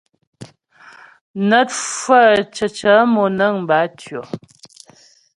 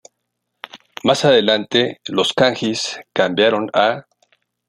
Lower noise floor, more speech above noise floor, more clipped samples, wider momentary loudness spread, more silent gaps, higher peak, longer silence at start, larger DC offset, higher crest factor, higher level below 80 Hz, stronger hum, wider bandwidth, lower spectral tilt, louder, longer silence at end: second, -50 dBFS vs -75 dBFS; second, 35 dB vs 58 dB; neither; first, 19 LU vs 13 LU; first, 1.21-1.34 s vs none; about the same, 0 dBFS vs 0 dBFS; second, 0.4 s vs 0.75 s; neither; about the same, 18 dB vs 18 dB; about the same, -60 dBFS vs -62 dBFS; second, none vs 60 Hz at -45 dBFS; second, 11.5 kHz vs 13 kHz; about the same, -4 dB/octave vs -4 dB/octave; about the same, -15 LUFS vs -17 LUFS; first, 1 s vs 0.65 s